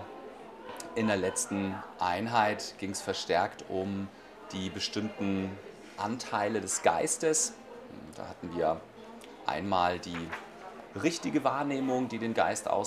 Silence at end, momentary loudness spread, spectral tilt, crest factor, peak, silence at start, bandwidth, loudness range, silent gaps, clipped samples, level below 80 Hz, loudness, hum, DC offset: 0 s; 18 LU; -3.5 dB/octave; 24 dB; -8 dBFS; 0 s; 15.5 kHz; 3 LU; none; under 0.1%; -66 dBFS; -32 LUFS; none; under 0.1%